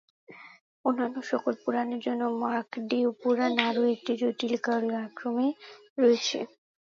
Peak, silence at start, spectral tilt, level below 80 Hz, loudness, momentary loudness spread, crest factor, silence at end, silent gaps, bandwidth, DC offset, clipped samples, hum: -4 dBFS; 0.3 s; -4 dB/octave; -80 dBFS; -28 LUFS; 8 LU; 24 dB; 0.4 s; 0.61-0.84 s, 5.90-5.96 s; 7.4 kHz; under 0.1%; under 0.1%; none